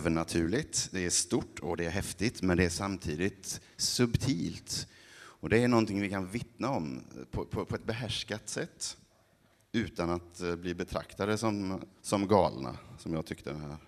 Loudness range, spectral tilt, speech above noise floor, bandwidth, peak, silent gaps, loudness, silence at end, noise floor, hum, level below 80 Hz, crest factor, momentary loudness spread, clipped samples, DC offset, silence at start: 5 LU; -4.5 dB/octave; 34 dB; 13.5 kHz; -10 dBFS; none; -33 LUFS; 0.1 s; -67 dBFS; none; -54 dBFS; 24 dB; 12 LU; under 0.1%; under 0.1%; 0 s